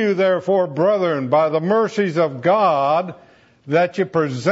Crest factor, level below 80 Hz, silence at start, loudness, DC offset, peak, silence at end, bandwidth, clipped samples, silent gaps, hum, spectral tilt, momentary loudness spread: 14 dB; -68 dBFS; 0 s; -18 LUFS; under 0.1%; -4 dBFS; 0 s; 8 kHz; under 0.1%; none; none; -7 dB/octave; 4 LU